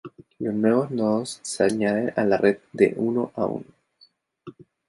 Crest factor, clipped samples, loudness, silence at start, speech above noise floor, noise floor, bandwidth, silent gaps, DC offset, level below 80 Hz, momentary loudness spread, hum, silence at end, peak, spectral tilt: 20 dB; under 0.1%; -23 LUFS; 0.05 s; 37 dB; -60 dBFS; 11.5 kHz; none; under 0.1%; -62 dBFS; 8 LU; none; 0.4 s; -4 dBFS; -5.5 dB/octave